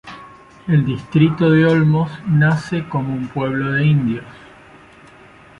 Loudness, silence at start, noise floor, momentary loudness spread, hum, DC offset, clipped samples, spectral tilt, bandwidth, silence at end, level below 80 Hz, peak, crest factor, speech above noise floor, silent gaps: -17 LUFS; 0.05 s; -44 dBFS; 10 LU; none; under 0.1%; under 0.1%; -8.5 dB/octave; 7 kHz; 1.3 s; -50 dBFS; -2 dBFS; 16 dB; 28 dB; none